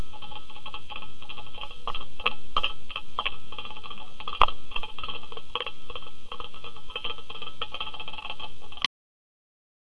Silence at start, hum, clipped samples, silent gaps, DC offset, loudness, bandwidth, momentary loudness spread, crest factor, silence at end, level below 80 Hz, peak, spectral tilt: 0 s; 50 Hz at -60 dBFS; under 0.1%; none; 5%; -34 LUFS; 11.5 kHz; 13 LU; 28 dB; 1.15 s; -46 dBFS; 0 dBFS; -3 dB/octave